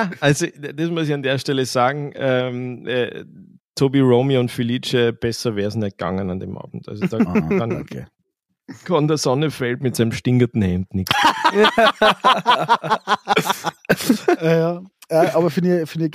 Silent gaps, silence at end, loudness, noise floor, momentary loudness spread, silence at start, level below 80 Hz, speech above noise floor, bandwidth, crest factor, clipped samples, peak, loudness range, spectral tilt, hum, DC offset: 3.60-3.72 s; 0 s; -19 LUFS; -73 dBFS; 11 LU; 0 s; -52 dBFS; 54 dB; 15.5 kHz; 16 dB; under 0.1%; -2 dBFS; 6 LU; -5.5 dB/octave; none; under 0.1%